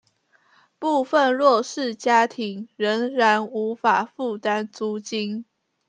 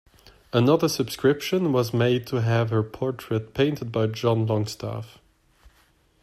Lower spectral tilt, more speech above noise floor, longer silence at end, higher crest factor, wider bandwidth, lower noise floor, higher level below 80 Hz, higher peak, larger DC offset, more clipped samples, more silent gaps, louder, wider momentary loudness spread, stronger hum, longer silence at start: second, -4 dB/octave vs -6.5 dB/octave; about the same, 41 dB vs 38 dB; second, 0.45 s vs 1.15 s; about the same, 18 dB vs 18 dB; second, 10 kHz vs 14.5 kHz; about the same, -63 dBFS vs -61 dBFS; second, -78 dBFS vs -56 dBFS; first, -4 dBFS vs -8 dBFS; neither; neither; neither; about the same, -22 LUFS vs -24 LUFS; about the same, 10 LU vs 9 LU; neither; first, 0.8 s vs 0.55 s